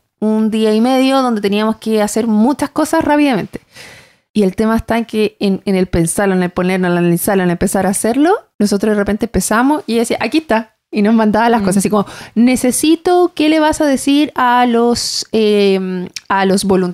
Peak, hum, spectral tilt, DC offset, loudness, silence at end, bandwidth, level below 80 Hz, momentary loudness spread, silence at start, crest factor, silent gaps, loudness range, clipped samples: -2 dBFS; none; -5 dB/octave; under 0.1%; -14 LUFS; 0 s; 16 kHz; -40 dBFS; 5 LU; 0.2 s; 10 dB; 4.30-4.34 s, 8.54-8.59 s; 3 LU; under 0.1%